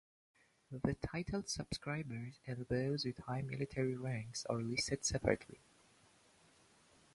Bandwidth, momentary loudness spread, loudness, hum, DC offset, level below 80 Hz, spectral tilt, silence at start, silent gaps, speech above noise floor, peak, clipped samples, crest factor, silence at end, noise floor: 11.5 kHz; 10 LU; -40 LUFS; none; under 0.1%; -60 dBFS; -4.5 dB/octave; 0.7 s; none; 29 dB; -18 dBFS; under 0.1%; 24 dB; 1.6 s; -69 dBFS